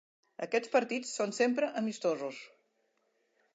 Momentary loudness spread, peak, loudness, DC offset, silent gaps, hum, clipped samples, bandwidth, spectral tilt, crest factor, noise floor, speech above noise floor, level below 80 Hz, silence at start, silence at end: 11 LU; -16 dBFS; -33 LUFS; under 0.1%; none; none; under 0.1%; 9.2 kHz; -3.5 dB/octave; 18 dB; -76 dBFS; 44 dB; under -90 dBFS; 0.4 s; 1.1 s